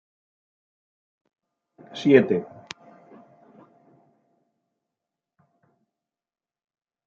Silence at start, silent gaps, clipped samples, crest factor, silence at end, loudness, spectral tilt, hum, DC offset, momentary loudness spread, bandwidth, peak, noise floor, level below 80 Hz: 1.95 s; none; under 0.1%; 28 dB; 4.6 s; -20 LUFS; -5.5 dB/octave; none; under 0.1%; 24 LU; 7.4 kHz; -2 dBFS; under -90 dBFS; -76 dBFS